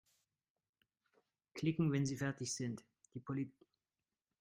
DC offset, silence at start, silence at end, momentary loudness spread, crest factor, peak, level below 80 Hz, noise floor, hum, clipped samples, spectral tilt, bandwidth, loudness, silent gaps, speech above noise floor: under 0.1%; 1.55 s; 0.9 s; 17 LU; 20 dB; -24 dBFS; -76 dBFS; under -90 dBFS; none; under 0.1%; -5.5 dB/octave; 15.5 kHz; -40 LUFS; none; over 51 dB